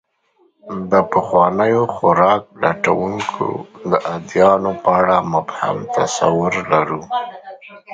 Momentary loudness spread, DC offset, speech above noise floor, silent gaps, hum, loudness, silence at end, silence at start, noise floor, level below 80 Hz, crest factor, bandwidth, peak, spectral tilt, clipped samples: 10 LU; under 0.1%; 42 dB; none; none; -17 LUFS; 0 s; 0.65 s; -59 dBFS; -52 dBFS; 18 dB; 9.2 kHz; 0 dBFS; -5.5 dB/octave; under 0.1%